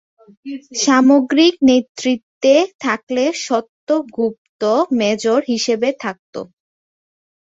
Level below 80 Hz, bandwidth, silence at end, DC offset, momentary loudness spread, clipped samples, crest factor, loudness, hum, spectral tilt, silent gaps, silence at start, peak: -62 dBFS; 8 kHz; 1.1 s; under 0.1%; 17 LU; under 0.1%; 16 dB; -16 LUFS; none; -3.5 dB/octave; 1.89-1.95 s, 2.23-2.41 s, 2.74-2.79 s, 3.03-3.07 s, 3.69-3.87 s, 4.38-4.59 s, 6.19-6.33 s; 0.45 s; -2 dBFS